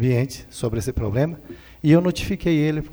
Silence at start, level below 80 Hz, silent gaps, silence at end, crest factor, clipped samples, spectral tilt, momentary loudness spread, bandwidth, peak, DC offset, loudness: 0 s; -38 dBFS; none; 0 s; 18 dB; under 0.1%; -7 dB/octave; 11 LU; over 20 kHz; -4 dBFS; under 0.1%; -22 LUFS